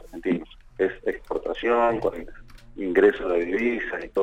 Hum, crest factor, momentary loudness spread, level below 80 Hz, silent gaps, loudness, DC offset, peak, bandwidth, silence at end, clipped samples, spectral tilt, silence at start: none; 18 dB; 12 LU; -46 dBFS; none; -25 LUFS; under 0.1%; -6 dBFS; 8.8 kHz; 0 s; under 0.1%; -7 dB/octave; 0 s